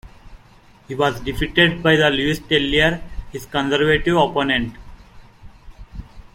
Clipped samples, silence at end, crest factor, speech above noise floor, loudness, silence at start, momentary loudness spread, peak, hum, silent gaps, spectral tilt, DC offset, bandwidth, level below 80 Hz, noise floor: under 0.1%; 0.15 s; 18 dB; 30 dB; -18 LUFS; 0.05 s; 18 LU; -2 dBFS; none; none; -5 dB/octave; under 0.1%; 16.5 kHz; -36 dBFS; -49 dBFS